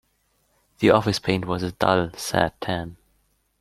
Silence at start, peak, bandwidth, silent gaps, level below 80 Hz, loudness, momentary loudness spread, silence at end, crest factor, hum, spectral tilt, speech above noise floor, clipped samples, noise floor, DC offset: 0.8 s; -2 dBFS; 15 kHz; none; -52 dBFS; -23 LUFS; 10 LU; 0.7 s; 22 dB; none; -5.5 dB/octave; 46 dB; under 0.1%; -68 dBFS; under 0.1%